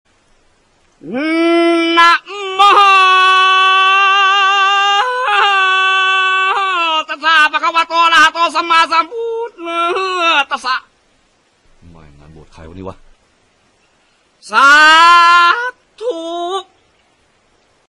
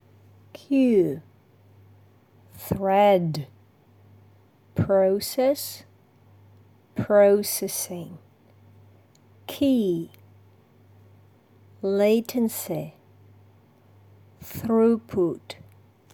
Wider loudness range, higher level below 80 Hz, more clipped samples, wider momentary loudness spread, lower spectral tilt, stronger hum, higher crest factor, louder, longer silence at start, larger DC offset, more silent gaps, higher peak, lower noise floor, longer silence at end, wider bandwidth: first, 9 LU vs 5 LU; first, -54 dBFS vs -62 dBFS; neither; second, 15 LU vs 22 LU; second, -1.5 dB/octave vs -5.5 dB/octave; neither; second, 12 dB vs 20 dB; first, -10 LUFS vs -23 LUFS; first, 1.05 s vs 0.7 s; neither; neither; first, 0 dBFS vs -6 dBFS; about the same, -56 dBFS vs -56 dBFS; first, 1.3 s vs 0.6 s; second, 14 kHz vs over 20 kHz